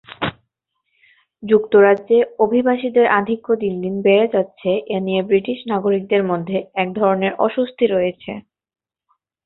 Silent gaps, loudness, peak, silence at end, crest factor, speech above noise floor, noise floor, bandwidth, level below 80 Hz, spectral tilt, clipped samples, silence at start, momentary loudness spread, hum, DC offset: none; -18 LUFS; -2 dBFS; 1.05 s; 16 dB; 56 dB; -73 dBFS; 4.1 kHz; -58 dBFS; -10 dB/octave; under 0.1%; 0.1 s; 9 LU; none; under 0.1%